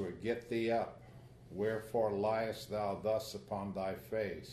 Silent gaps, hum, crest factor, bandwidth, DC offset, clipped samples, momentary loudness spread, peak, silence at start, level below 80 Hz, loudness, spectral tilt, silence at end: none; none; 16 dB; 13.5 kHz; under 0.1%; under 0.1%; 10 LU; -22 dBFS; 0 s; -64 dBFS; -38 LUFS; -6 dB/octave; 0 s